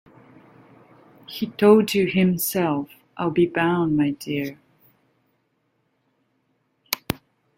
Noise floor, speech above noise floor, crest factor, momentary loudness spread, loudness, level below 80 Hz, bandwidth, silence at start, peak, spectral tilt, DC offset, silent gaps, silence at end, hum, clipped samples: -70 dBFS; 50 dB; 24 dB; 15 LU; -22 LUFS; -60 dBFS; 16.5 kHz; 1.3 s; 0 dBFS; -5.5 dB/octave; under 0.1%; none; 0.4 s; none; under 0.1%